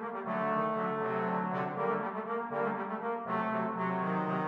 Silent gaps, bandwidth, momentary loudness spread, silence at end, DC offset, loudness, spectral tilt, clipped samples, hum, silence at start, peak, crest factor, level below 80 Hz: none; 5.8 kHz; 4 LU; 0 s; under 0.1%; -33 LUFS; -9 dB/octave; under 0.1%; none; 0 s; -20 dBFS; 14 dB; -82 dBFS